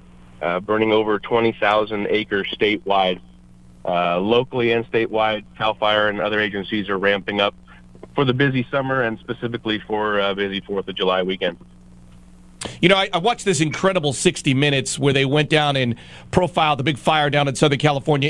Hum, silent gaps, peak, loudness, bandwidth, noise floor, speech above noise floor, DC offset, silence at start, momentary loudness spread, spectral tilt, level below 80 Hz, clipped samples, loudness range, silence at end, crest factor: none; none; 0 dBFS; -20 LUFS; 11.5 kHz; -46 dBFS; 26 dB; under 0.1%; 0.4 s; 7 LU; -5 dB/octave; -50 dBFS; under 0.1%; 4 LU; 0 s; 20 dB